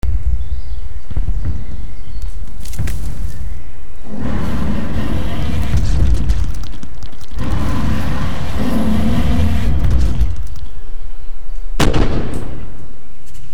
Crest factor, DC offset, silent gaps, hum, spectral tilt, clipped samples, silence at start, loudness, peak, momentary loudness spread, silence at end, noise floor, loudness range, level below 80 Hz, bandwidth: 16 dB; 30%; none; none; -6.5 dB/octave; under 0.1%; 0 s; -21 LUFS; 0 dBFS; 17 LU; 0 s; -38 dBFS; 8 LU; -20 dBFS; 16.5 kHz